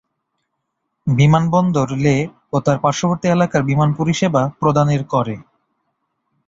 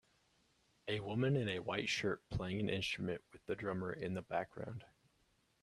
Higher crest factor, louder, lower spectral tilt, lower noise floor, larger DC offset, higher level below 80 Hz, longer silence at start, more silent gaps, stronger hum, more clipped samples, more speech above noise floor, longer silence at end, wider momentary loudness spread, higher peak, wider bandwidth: about the same, 16 dB vs 20 dB; first, -17 LUFS vs -40 LUFS; first, -7 dB/octave vs -5.5 dB/octave; about the same, -74 dBFS vs -77 dBFS; neither; first, -48 dBFS vs -64 dBFS; first, 1.05 s vs 0.85 s; neither; neither; neither; first, 58 dB vs 37 dB; first, 1.05 s vs 0.75 s; second, 7 LU vs 11 LU; first, -2 dBFS vs -22 dBFS; second, 7.8 kHz vs 12.5 kHz